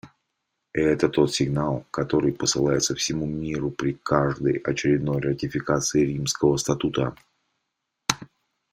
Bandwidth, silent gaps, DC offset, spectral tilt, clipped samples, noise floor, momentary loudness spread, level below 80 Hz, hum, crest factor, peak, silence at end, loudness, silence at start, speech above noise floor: 16 kHz; none; under 0.1%; -4.5 dB/octave; under 0.1%; -80 dBFS; 7 LU; -50 dBFS; none; 24 dB; -2 dBFS; 0.45 s; -24 LUFS; 0.05 s; 56 dB